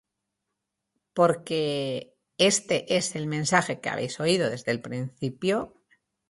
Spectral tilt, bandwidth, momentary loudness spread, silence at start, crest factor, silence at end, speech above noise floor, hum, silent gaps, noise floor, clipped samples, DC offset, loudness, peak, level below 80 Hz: -4 dB/octave; 11.5 kHz; 11 LU; 1.15 s; 22 dB; 0.6 s; 57 dB; none; none; -83 dBFS; under 0.1%; under 0.1%; -26 LUFS; -6 dBFS; -66 dBFS